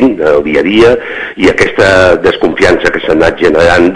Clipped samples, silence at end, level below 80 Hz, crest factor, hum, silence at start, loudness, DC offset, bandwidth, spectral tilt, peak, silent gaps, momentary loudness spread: 6%; 0 s; -30 dBFS; 8 dB; none; 0 s; -8 LUFS; under 0.1%; 11 kHz; -5.5 dB/octave; 0 dBFS; none; 4 LU